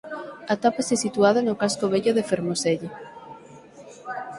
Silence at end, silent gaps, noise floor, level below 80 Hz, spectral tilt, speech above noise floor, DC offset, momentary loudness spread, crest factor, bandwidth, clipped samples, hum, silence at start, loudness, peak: 0 s; none; -46 dBFS; -66 dBFS; -4.5 dB/octave; 23 dB; under 0.1%; 21 LU; 20 dB; 11.5 kHz; under 0.1%; none; 0.05 s; -23 LUFS; -4 dBFS